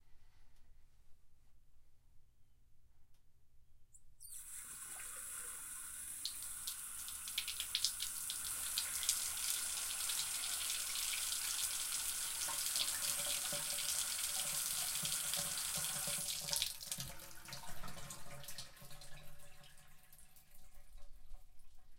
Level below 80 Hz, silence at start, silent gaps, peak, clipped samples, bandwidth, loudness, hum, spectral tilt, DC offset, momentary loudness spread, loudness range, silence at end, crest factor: -62 dBFS; 0 s; none; -14 dBFS; under 0.1%; 17 kHz; -39 LUFS; none; 1 dB/octave; under 0.1%; 14 LU; 16 LU; 0 s; 30 dB